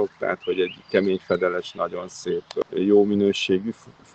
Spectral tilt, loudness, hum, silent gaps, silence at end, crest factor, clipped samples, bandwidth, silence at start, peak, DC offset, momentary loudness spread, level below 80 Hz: -5.5 dB/octave; -23 LUFS; none; none; 0.25 s; 18 dB; under 0.1%; 8.4 kHz; 0 s; -4 dBFS; under 0.1%; 11 LU; -64 dBFS